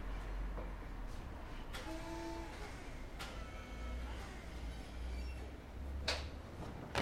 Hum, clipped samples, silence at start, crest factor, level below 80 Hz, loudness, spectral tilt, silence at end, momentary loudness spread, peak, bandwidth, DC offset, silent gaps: none; under 0.1%; 0 s; 24 dB; -48 dBFS; -47 LUFS; -4.5 dB/octave; 0 s; 7 LU; -22 dBFS; 16 kHz; under 0.1%; none